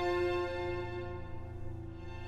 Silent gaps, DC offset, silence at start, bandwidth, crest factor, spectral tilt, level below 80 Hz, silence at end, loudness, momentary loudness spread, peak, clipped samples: none; under 0.1%; 0 s; 9.4 kHz; 14 dB; -7 dB/octave; -48 dBFS; 0 s; -38 LUFS; 13 LU; -22 dBFS; under 0.1%